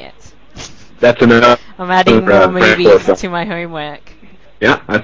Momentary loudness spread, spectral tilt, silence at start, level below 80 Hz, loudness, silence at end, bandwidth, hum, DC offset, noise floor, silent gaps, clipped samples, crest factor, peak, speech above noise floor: 18 LU; -5.5 dB/octave; 0.55 s; -40 dBFS; -10 LUFS; 0 s; 7.8 kHz; none; 1%; -42 dBFS; none; under 0.1%; 12 dB; 0 dBFS; 32 dB